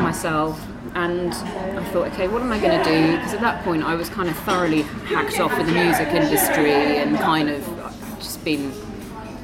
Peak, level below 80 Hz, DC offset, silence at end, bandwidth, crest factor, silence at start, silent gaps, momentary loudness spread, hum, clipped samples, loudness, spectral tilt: -6 dBFS; -44 dBFS; under 0.1%; 0 s; 16.5 kHz; 16 dB; 0 s; none; 13 LU; none; under 0.1%; -21 LUFS; -4.5 dB/octave